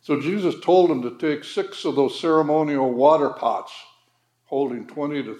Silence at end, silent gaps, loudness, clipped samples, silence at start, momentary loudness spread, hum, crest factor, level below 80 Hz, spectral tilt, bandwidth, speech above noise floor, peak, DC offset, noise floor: 0 s; none; -21 LUFS; under 0.1%; 0.1 s; 11 LU; none; 18 dB; -84 dBFS; -6.5 dB/octave; 11 kHz; 45 dB; -2 dBFS; under 0.1%; -66 dBFS